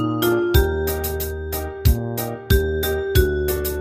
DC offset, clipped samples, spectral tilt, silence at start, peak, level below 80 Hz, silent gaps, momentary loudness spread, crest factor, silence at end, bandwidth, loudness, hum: under 0.1%; under 0.1%; -5.5 dB/octave; 0 s; -2 dBFS; -24 dBFS; none; 8 LU; 18 dB; 0 s; 15.5 kHz; -21 LUFS; none